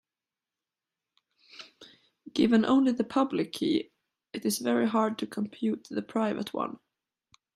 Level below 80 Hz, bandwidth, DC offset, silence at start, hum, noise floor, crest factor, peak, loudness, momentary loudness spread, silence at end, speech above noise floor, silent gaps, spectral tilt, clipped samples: -72 dBFS; 15 kHz; under 0.1%; 1.55 s; none; under -90 dBFS; 20 dB; -12 dBFS; -28 LUFS; 22 LU; 0.8 s; over 63 dB; none; -5 dB/octave; under 0.1%